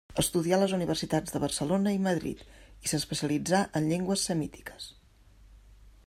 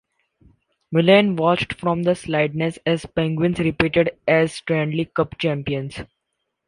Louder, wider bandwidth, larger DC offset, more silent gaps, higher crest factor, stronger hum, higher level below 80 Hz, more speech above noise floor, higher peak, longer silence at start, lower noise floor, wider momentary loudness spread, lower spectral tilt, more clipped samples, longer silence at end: second, -29 LUFS vs -20 LUFS; first, 16 kHz vs 11 kHz; neither; neither; about the same, 18 dB vs 18 dB; neither; second, -54 dBFS vs -48 dBFS; second, 28 dB vs 57 dB; second, -12 dBFS vs -2 dBFS; second, 0.1 s vs 0.9 s; second, -57 dBFS vs -77 dBFS; first, 14 LU vs 9 LU; second, -4.5 dB/octave vs -6.5 dB/octave; neither; second, 0.15 s vs 0.65 s